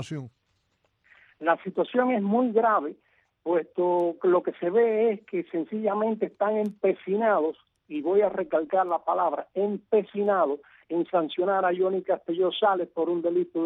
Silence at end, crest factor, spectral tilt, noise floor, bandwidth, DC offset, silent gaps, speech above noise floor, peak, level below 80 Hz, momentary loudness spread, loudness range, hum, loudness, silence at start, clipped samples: 0 s; 16 dB; -7.5 dB/octave; -72 dBFS; 7.2 kHz; under 0.1%; none; 47 dB; -10 dBFS; -74 dBFS; 7 LU; 2 LU; none; -26 LUFS; 0 s; under 0.1%